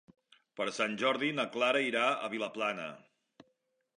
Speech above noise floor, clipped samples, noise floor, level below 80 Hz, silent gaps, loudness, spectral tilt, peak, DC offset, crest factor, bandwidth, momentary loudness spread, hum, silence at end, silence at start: 45 dB; under 0.1%; -78 dBFS; -84 dBFS; none; -32 LUFS; -3.5 dB/octave; -16 dBFS; under 0.1%; 20 dB; 11 kHz; 10 LU; none; 1 s; 0.55 s